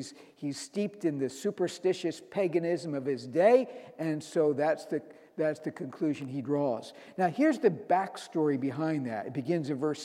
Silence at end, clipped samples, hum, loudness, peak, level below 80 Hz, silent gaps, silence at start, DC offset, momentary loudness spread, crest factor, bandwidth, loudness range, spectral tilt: 0 s; under 0.1%; none; -31 LUFS; -10 dBFS; -82 dBFS; none; 0 s; under 0.1%; 11 LU; 20 dB; 13.5 kHz; 3 LU; -6.5 dB/octave